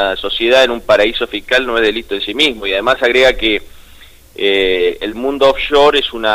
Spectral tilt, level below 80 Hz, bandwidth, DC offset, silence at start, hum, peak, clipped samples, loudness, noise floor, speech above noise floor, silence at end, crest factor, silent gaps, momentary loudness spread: -3 dB/octave; -36 dBFS; 16 kHz; under 0.1%; 0 s; none; -2 dBFS; under 0.1%; -13 LUFS; -40 dBFS; 26 dB; 0 s; 12 dB; none; 9 LU